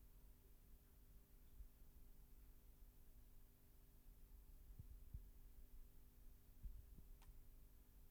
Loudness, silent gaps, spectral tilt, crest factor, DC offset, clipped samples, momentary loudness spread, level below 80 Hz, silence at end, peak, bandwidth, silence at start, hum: -66 LUFS; none; -5.5 dB/octave; 20 dB; under 0.1%; under 0.1%; 7 LU; -64 dBFS; 0 s; -42 dBFS; over 20 kHz; 0 s; none